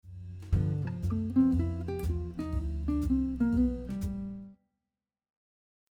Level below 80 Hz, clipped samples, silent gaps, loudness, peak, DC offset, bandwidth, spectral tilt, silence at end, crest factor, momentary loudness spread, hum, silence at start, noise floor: -40 dBFS; under 0.1%; none; -31 LUFS; -16 dBFS; under 0.1%; 13.5 kHz; -9.5 dB/octave; 1.4 s; 16 dB; 11 LU; none; 0.05 s; under -90 dBFS